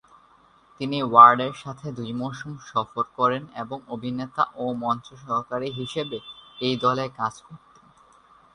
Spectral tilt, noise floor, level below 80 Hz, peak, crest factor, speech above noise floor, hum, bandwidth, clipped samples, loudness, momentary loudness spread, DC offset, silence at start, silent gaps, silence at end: -6 dB/octave; -57 dBFS; -64 dBFS; 0 dBFS; 24 dB; 33 dB; none; 10.5 kHz; under 0.1%; -23 LUFS; 18 LU; under 0.1%; 0.8 s; none; 1 s